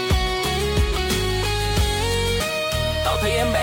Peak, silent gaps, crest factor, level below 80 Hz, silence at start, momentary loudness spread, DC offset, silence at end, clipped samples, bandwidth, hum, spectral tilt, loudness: -10 dBFS; none; 12 dB; -28 dBFS; 0 s; 2 LU; under 0.1%; 0 s; under 0.1%; 17 kHz; none; -4 dB/octave; -21 LUFS